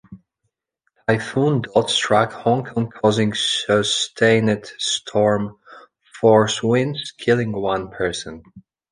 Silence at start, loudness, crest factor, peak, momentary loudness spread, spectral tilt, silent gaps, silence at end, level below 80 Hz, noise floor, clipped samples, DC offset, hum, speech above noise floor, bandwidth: 0.1 s; -19 LUFS; 18 dB; -2 dBFS; 9 LU; -4.5 dB/octave; none; 0.3 s; -54 dBFS; -75 dBFS; under 0.1%; under 0.1%; none; 56 dB; 10.5 kHz